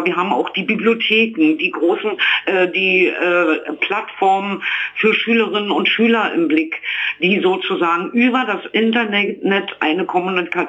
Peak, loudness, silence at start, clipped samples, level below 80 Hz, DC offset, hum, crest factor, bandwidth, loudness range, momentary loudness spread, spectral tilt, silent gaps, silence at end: -4 dBFS; -16 LUFS; 0 s; under 0.1%; -70 dBFS; under 0.1%; 50 Hz at -65 dBFS; 14 dB; 8 kHz; 1 LU; 5 LU; -6 dB/octave; none; 0 s